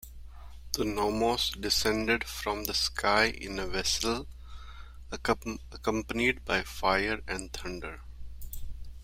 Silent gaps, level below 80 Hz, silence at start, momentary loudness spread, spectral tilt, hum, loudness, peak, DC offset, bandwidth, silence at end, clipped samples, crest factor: none; -44 dBFS; 0 s; 21 LU; -3 dB/octave; none; -30 LUFS; -8 dBFS; under 0.1%; 16.5 kHz; 0 s; under 0.1%; 24 dB